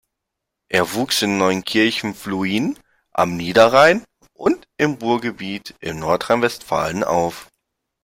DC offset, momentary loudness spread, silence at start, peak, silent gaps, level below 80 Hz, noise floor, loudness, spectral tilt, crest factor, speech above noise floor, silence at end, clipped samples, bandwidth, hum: under 0.1%; 13 LU; 0.7 s; 0 dBFS; none; -54 dBFS; -80 dBFS; -19 LUFS; -4.5 dB/octave; 18 dB; 62 dB; 0.6 s; under 0.1%; 16.5 kHz; none